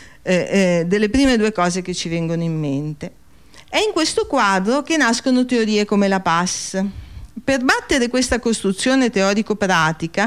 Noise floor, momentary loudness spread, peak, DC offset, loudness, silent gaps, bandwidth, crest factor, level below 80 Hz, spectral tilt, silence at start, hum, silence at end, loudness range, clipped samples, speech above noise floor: -47 dBFS; 7 LU; -6 dBFS; 0.5%; -18 LUFS; none; 15.5 kHz; 14 dB; -42 dBFS; -4.5 dB/octave; 0 s; none; 0 s; 3 LU; under 0.1%; 29 dB